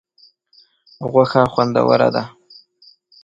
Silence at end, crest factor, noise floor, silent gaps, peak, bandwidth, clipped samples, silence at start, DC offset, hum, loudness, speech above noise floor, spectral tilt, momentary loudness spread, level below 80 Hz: 0.95 s; 18 dB; -55 dBFS; none; 0 dBFS; 7.6 kHz; under 0.1%; 1 s; under 0.1%; none; -16 LUFS; 39 dB; -7.5 dB/octave; 13 LU; -56 dBFS